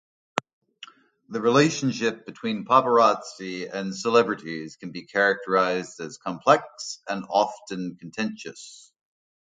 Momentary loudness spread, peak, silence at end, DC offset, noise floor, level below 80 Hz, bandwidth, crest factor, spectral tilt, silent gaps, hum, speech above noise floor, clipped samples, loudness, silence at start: 15 LU; 0 dBFS; 0.8 s; under 0.1%; -49 dBFS; -72 dBFS; 9.4 kHz; 24 dB; -4.5 dB/octave; 0.53-0.61 s; none; 25 dB; under 0.1%; -24 LUFS; 0.35 s